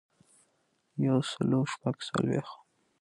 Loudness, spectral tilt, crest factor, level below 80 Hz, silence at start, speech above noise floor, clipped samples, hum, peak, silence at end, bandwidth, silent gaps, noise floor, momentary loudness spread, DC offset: -30 LUFS; -6.5 dB/octave; 18 dB; -68 dBFS; 0.95 s; 44 dB; under 0.1%; none; -16 dBFS; 0.45 s; 11.5 kHz; none; -74 dBFS; 8 LU; under 0.1%